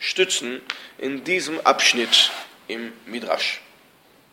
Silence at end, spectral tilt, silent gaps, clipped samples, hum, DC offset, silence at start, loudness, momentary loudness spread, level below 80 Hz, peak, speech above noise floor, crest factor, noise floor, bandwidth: 0.7 s; -0.5 dB/octave; none; under 0.1%; none; under 0.1%; 0 s; -20 LUFS; 17 LU; -74 dBFS; 0 dBFS; 32 dB; 22 dB; -55 dBFS; 17 kHz